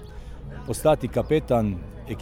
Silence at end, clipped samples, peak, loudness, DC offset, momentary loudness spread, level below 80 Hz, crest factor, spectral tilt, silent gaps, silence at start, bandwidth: 0 s; under 0.1%; -8 dBFS; -24 LUFS; under 0.1%; 18 LU; -38 dBFS; 18 dB; -6.5 dB/octave; none; 0 s; 17 kHz